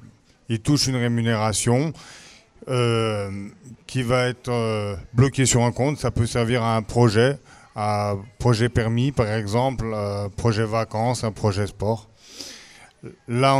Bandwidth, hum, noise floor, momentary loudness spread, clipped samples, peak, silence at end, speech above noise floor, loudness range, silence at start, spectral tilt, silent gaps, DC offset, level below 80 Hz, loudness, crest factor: 13.5 kHz; none; -46 dBFS; 17 LU; under 0.1%; -4 dBFS; 0 s; 24 dB; 4 LU; 0 s; -5.5 dB/octave; none; under 0.1%; -44 dBFS; -22 LUFS; 18 dB